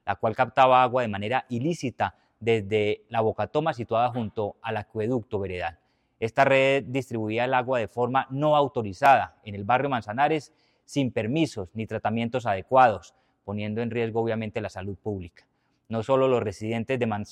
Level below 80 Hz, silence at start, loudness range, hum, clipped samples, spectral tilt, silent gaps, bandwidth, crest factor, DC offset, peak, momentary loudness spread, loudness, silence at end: -62 dBFS; 0.05 s; 4 LU; none; under 0.1%; -6.5 dB/octave; none; 13 kHz; 20 dB; under 0.1%; -6 dBFS; 13 LU; -25 LUFS; 0 s